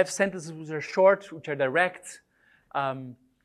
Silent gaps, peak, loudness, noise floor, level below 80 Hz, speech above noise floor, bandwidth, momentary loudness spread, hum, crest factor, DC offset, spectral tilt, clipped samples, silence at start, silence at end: none; -8 dBFS; -26 LUFS; -62 dBFS; -72 dBFS; 35 dB; 13 kHz; 19 LU; none; 20 dB; under 0.1%; -4.5 dB/octave; under 0.1%; 0 s; 0.3 s